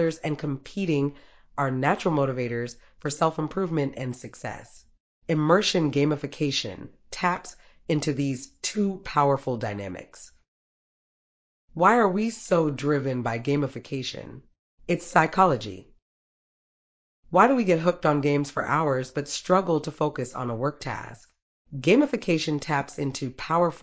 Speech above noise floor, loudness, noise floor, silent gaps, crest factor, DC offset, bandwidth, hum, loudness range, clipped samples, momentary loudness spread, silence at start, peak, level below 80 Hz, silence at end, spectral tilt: over 65 dB; -25 LUFS; under -90 dBFS; 5.00-5.22 s, 10.48-11.68 s, 14.59-14.78 s, 16.02-17.23 s, 21.42-21.65 s; 22 dB; under 0.1%; 8 kHz; none; 4 LU; under 0.1%; 16 LU; 0 s; -4 dBFS; -58 dBFS; 0.05 s; -5.5 dB/octave